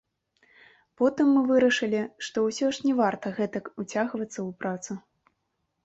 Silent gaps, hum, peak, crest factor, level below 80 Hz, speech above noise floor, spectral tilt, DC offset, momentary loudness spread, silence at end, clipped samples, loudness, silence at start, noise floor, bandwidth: none; none; -12 dBFS; 16 dB; -70 dBFS; 52 dB; -5 dB/octave; under 0.1%; 13 LU; 0.85 s; under 0.1%; -26 LUFS; 1 s; -78 dBFS; 8.2 kHz